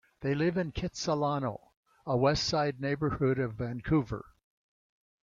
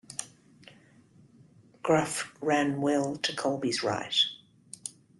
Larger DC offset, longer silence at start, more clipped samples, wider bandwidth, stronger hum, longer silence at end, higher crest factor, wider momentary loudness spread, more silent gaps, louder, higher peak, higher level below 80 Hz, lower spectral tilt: neither; about the same, 0.2 s vs 0.1 s; neither; second, 7.6 kHz vs 12.5 kHz; neither; first, 1 s vs 0.3 s; about the same, 18 dB vs 20 dB; second, 10 LU vs 15 LU; first, 1.77-1.83 s vs none; about the same, -31 LUFS vs -29 LUFS; about the same, -14 dBFS vs -12 dBFS; first, -52 dBFS vs -72 dBFS; first, -6 dB/octave vs -3.5 dB/octave